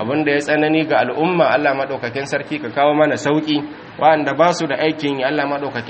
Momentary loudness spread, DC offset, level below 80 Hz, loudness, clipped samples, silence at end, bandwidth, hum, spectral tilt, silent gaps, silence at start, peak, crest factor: 8 LU; under 0.1%; -60 dBFS; -17 LUFS; under 0.1%; 0 s; 8.8 kHz; none; -5.5 dB/octave; none; 0 s; 0 dBFS; 16 dB